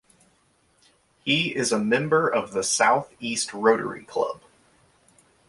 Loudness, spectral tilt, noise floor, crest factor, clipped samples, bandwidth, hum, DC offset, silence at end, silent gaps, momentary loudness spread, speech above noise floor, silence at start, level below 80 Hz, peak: -23 LUFS; -3 dB/octave; -64 dBFS; 22 dB; under 0.1%; 11.5 kHz; none; under 0.1%; 1.15 s; none; 9 LU; 41 dB; 1.25 s; -66 dBFS; -4 dBFS